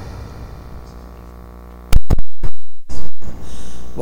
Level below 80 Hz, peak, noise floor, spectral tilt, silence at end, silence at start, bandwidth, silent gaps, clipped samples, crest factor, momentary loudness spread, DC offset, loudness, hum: -22 dBFS; 0 dBFS; -36 dBFS; -6 dB/octave; 0 s; 0 s; 11.5 kHz; none; under 0.1%; 8 dB; 16 LU; under 0.1%; -28 LUFS; none